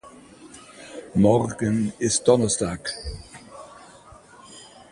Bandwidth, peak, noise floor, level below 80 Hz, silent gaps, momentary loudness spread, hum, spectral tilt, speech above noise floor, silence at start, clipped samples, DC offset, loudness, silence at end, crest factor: 11.5 kHz; -4 dBFS; -48 dBFS; -46 dBFS; none; 25 LU; none; -5 dB/octave; 27 dB; 0.05 s; under 0.1%; under 0.1%; -22 LUFS; 0.3 s; 22 dB